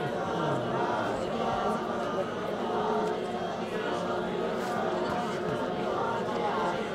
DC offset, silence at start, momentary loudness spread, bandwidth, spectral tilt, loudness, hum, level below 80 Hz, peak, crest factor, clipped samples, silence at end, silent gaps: under 0.1%; 0 s; 3 LU; 15.5 kHz; -6 dB/octave; -31 LUFS; none; -58 dBFS; -18 dBFS; 14 dB; under 0.1%; 0 s; none